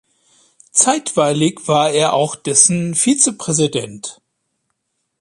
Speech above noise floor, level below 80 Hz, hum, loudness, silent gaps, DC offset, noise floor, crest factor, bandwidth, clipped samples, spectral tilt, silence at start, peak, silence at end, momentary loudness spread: 56 dB; -60 dBFS; none; -14 LUFS; none; under 0.1%; -71 dBFS; 18 dB; 13 kHz; under 0.1%; -3.5 dB/octave; 0.75 s; 0 dBFS; 1.1 s; 10 LU